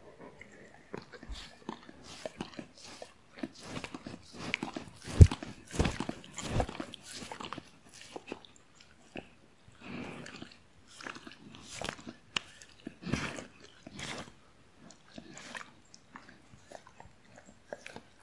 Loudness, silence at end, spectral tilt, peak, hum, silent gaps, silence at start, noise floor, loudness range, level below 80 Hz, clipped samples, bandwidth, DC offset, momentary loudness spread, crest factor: -36 LUFS; 0.2 s; -5.5 dB/octave; -2 dBFS; none; none; 0.05 s; -62 dBFS; 17 LU; -46 dBFS; under 0.1%; 11.5 kHz; under 0.1%; 18 LU; 34 dB